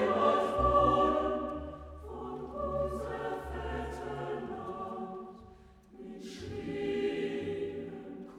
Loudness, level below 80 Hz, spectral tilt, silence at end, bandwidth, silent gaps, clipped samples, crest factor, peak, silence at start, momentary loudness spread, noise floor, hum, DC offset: -33 LUFS; -48 dBFS; -7 dB/octave; 0 s; 13 kHz; none; under 0.1%; 20 dB; -14 dBFS; 0 s; 18 LU; -56 dBFS; none; under 0.1%